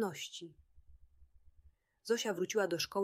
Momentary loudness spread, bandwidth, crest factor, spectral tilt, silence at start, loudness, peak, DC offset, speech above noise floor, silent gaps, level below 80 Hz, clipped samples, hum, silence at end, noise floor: 17 LU; 16 kHz; 18 dB; -3 dB/octave; 0 s; -36 LUFS; -20 dBFS; under 0.1%; 30 dB; none; -68 dBFS; under 0.1%; none; 0 s; -67 dBFS